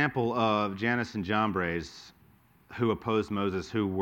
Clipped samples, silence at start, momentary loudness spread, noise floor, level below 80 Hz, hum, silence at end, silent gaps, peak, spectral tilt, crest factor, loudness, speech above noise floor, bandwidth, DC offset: under 0.1%; 0 s; 8 LU; -61 dBFS; -58 dBFS; none; 0 s; none; -12 dBFS; -6.5 dB/octave; 18 dB; -29 LUFS; 32 dB; 16.5 kHz; under 0.1%